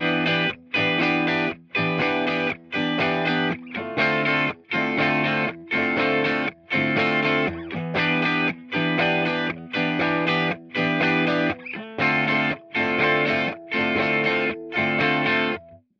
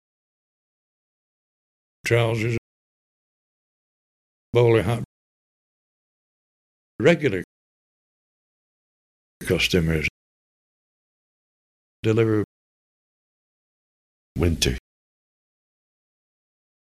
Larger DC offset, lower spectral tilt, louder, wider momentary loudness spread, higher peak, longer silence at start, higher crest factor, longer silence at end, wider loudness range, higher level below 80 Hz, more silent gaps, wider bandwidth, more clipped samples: neither; about the same, -6.5 dB/octave vs -5.5 dB/octave; about the same, -22 LUFS vs -22 LUFS; second, 6 LU vs 15 LU; about the same, -8 dBFS vs -6 dBFS; second, 0 s vs 2.05 s; second, 16 dB vs 22 dB; second, 0.25 s vs 2.15 s; second, 1 LU vs 5 LU; second, -60 dBFS vs -44 dBFS; second, none vs 2.58-4.53 s, 5.05-6.99 s, 7.44-9.40 s, 10.10-12.03 s, 12.44-14.35 s; second, 7.4 kHz vs 15 kHz; neither